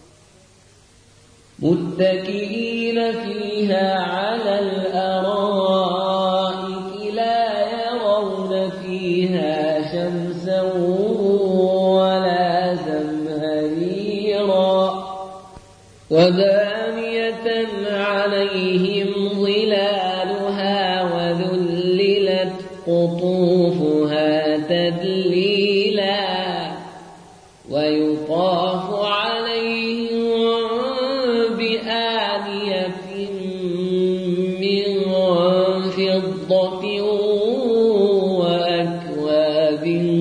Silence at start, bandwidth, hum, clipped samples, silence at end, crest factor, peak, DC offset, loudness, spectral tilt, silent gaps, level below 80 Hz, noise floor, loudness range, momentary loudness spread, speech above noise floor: 1.6 s; 10.5 kHz; none; under 0.1%; 0 s; 16 dB; -4 dBFS; under 0.1%; -20 LUFS; -6.5 dB/octave; none; -60 dBFS; -51 dBFS; 3 LU; 7 LU; 33 dB